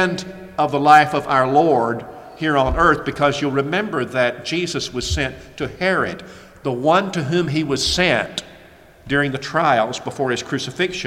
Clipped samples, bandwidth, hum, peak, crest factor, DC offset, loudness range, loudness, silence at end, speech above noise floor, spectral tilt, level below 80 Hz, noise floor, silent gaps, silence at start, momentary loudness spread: under 0.1%; 16 kHz; none; 0 dBFS; 18 dB; under 0.1%; 5 LU; -19 LUFS; 0 s; 27 dB; -4.5 dB/octave; -38 dBFS; -46 dBFS; none; 0 s; 11 LU